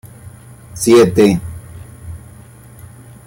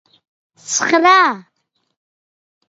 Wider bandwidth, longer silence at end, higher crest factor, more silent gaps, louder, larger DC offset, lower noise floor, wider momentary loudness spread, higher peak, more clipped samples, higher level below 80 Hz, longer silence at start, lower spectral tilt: first, 17 kHz vs 8 kHz; second, 1.1 s vs 1.25 s; about the same, 16 dB vs 18 dB; neither; about the same, -12 LUFS vs -13 LUFS; neither; second, -39 dBFS vs under -90 dBFS; first, 25 LU vs 11 LU; about the same, -2 dBFS vs 0 dBFS; neither; first, -42 dBFS vs -68 dBFS; second, 0.25 s vs 0.65 s; first, -5.5 dB/octave vs -1 dB/octave